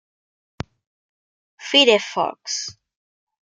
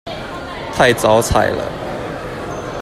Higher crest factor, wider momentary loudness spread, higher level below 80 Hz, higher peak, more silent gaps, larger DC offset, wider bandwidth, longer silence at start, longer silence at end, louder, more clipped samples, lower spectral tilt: about the same, 22 dB vs 18 dB; first, 23 LU vs 14 LU; second, -58 dBFS vs -34 dBFS; about the same, -2 dBFS vs 0 dBFS; neither; neither; second, 9.4 kHz vs 15 kHz; first, 1.6 s vs 0.05 s; first, 0.8 s vs 0 s; about the same, -18 LUFS vs -17 LUFS; neither; second, -2 dB/octave vs -4.5 dB/octave